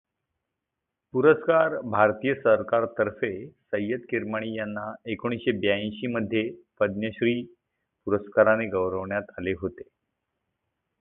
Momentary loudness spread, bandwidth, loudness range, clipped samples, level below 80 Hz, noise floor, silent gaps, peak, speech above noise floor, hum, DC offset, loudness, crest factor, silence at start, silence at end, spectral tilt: 11 LU; 3.9 kHz; 5 LU; under 0.1%; -58 dBFS; -85 dBFS; none; -4 dBFS; 59 dB; none; under 0.1%; -26 LUFS; 22 dB; 1.15 s; 1.15 s; -10.5 dB/octave